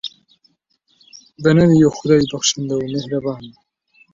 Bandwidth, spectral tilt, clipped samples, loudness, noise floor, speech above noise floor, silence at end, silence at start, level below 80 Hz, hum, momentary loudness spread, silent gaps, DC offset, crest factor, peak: 7.8 kHz; -5.5 dB/octave; under 0.1%; -16 LUFS; -63 dBFS; 48 dB; 0.65 s; 0.05 s; -50 dBFS; none; 14 LU; none; under 0.1%; 18 dB; -2 dBFS